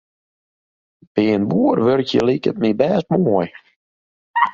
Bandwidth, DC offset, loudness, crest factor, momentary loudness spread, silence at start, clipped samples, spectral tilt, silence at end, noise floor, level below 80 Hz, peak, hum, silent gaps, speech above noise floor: 7.6 kHz; under 0.1%; -18 LUFS; 18 dB; 6 LU; 1.15 s; under 0.1%; -7.5 dB/octave; 0 s; under -90 dBFS; -56 dBFS; -2 dBFS; none; 3.76-4.34 s; over 73 dB